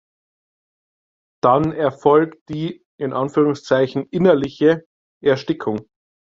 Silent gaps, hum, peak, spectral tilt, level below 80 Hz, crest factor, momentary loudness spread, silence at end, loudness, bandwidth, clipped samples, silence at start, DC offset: 2.41-2.46 s, 2.85-2.98 s, 4.86-5.21 s; none; -2 dBFS; -7.5 dB/octave; -56 dBFS; 18 dB; 11 LU; 0.4 s; -19 LUFS; 7.6 kHz; under 0.1%; 1.45 s; under 0.1%